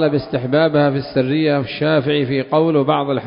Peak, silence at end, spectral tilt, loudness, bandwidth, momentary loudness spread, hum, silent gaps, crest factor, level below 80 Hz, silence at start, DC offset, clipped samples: 0 dBFS; 0 s; -12 dB/octave; -17 LUFS; 5.4 kHz; 3 LU; none; none; 16 dB; -52 dBFS; 0 s; under 0.1%; under 0.1%